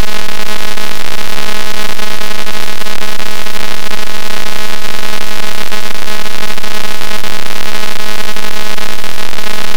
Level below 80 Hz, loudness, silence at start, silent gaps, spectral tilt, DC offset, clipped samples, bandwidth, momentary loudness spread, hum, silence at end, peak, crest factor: -40 dBFS; -19 LUFS; 0 s; none; -3 dB/octave; 100%; 50%; over 20 kHz; 1 LU; none; 0 s; 0 dBFS; 22 dB